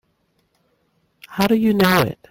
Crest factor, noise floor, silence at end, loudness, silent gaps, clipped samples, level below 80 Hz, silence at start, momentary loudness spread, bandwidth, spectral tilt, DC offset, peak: 20 dB; -66 dBFS; 0.15 s; -17 LUFS; none; under 0.1%; -50 dBFS; 1.3 s; 8 LU; 17 kHz; -5.5 dB/octave; under 0.1%; 0 dBFS